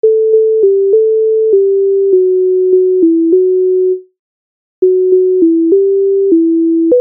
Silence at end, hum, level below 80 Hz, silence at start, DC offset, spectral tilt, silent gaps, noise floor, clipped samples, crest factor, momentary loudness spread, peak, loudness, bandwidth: 0 s; none; -66 dBFS; 0.05 s; under 0.1%; -11.5 dB/octave; 4.19-4.82 s; under -90 dBFS; under 0.1%; 8 dB; 2 LU; 0 dBFS; -10 LUFS; 0.8 kHz